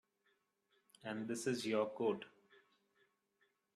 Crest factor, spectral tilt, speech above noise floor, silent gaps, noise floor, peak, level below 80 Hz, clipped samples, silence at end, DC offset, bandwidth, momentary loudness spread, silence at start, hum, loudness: 20 dB; -4.5 dB/octave; 41 dB; none; -81 dBFS; -24 dBFS; -86 dBFS; under 0.1%; 1.45 s; under 0.1%; 13 kHz; 12 LU; 1.05 s; none; -41 LUFS